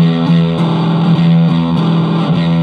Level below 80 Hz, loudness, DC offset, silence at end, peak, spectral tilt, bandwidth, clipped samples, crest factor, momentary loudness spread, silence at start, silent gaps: -44 dBFS; -12 LUFS; under 0.1%; 0 s; 0 dBFS; -9 dB/octave; 5.2 kHz; under 0.1%; 10 dB; 3 LU; 0 s; none